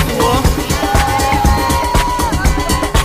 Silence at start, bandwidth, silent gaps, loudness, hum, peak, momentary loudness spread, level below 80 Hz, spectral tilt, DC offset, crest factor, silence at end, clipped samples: 0 s; 15.5 kHz; none; -14 LUFS; none; 0 dBFS; 2 LU; -18 dBFS; -4.5 dB/octave; under 0.1%; 12 dB; 0 s; under 0.1%